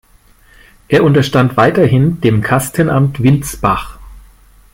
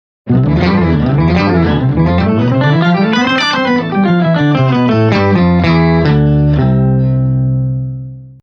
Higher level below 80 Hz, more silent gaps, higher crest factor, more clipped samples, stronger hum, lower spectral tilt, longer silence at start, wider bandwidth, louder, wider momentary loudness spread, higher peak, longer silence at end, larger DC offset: second, -36 dBFS vs -28 dBFS; neither; about the same, 12 dB vs 10 dB; neither; neither; second, -6.5 dB/octave vs -8 dB/octave; first, 0.9 s vs 0.25 s; first, 16.5 kHz vs 6.6 kHz; about the same, -12 LUFS vs -11 LUFS; about the same, 5 LU vs 3 LU; about the same, 0 dBFS vs 0 dBFS; first, 0.55 s vs 0.1 s; neither